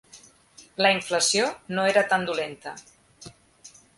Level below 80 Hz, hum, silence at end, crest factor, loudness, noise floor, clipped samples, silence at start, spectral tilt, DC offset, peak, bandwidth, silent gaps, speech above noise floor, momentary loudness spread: -66 dBFS; none; 0.3 s; 20 dB; -23 LUFS; -54 dBFS; under 0.1%; 0.15 s; -2 dB/octave; under 0.1%; -6 dBFS; 11.5 kHz; none; 29 dB; 19 LU